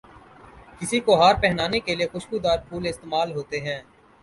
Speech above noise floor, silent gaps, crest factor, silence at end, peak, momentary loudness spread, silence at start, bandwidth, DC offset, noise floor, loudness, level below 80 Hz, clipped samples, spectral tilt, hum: 25 dB; none; 20 dB; 0.4 s; -4 dBFS; 13 LU; 0.55 s; 11.5 kHz; under 0.1%; -48 dBFS; -23 LUFS; -46 dBFS; under 0.1%; -4.5 dB/octave; none